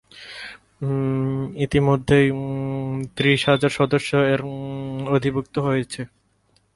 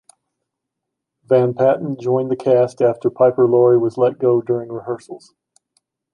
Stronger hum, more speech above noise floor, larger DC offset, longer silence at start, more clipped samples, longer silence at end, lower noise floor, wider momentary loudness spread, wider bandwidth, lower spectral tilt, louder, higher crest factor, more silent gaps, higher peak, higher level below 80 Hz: neither; second, 43 dB vs 64 dB; neither; second, 0.15 s vs 1.3 s; neither; second, 0.7 s vs 0.95 s; second, -63 dBFS vs -80 dBFS; first, 16 LU vs 13 LU; first, 11.5 kHz vs 10 kHz; second, -6.5 dB/octave vs -9 dB/octave; second, -21 LUFS vs -17 LUFS; about the same, 18 dB vs 16 dB; neither; about the same, -4 dBFS vs -2 dBFS; first, -48 dBFS vs -66 dBFS